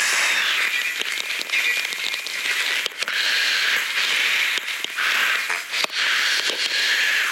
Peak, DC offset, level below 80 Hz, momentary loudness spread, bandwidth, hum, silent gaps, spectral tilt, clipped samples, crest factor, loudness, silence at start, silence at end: -2 dBFS; under 0.1%; -78 dBFS; 5 LU; 17 kHz; none; none; 3 dB/octave; under 0.1%; 20 dB; -20 LUFS; 0 s; 0 s